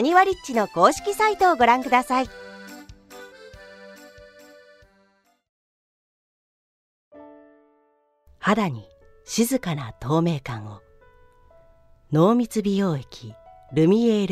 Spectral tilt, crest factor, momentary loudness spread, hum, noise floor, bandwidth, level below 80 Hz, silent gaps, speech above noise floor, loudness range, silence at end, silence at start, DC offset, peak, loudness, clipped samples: -5.5 dB/octave; 22 dB; 25 LU; none; -65 dBFS; 15.5 kHz; -54 dBFS; 5.49-7.11 s; 44 dB; 11 LU; 0 s; 0 s; under 0.1%; -2 dBFS; -21 LUFS; under 0.1%